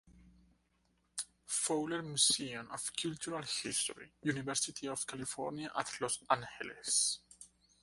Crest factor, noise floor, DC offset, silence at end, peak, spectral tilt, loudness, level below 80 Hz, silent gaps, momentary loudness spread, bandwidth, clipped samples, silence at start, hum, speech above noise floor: 24 dB; -76 dBFS; under 0.1%; 0.35 s; -14 dBFS; -2 dB/octave; -36 LUFS; -72 dBFS; none; 13 LU; 12 kHz; under 0.1%; 0.05 s; none; 39 dB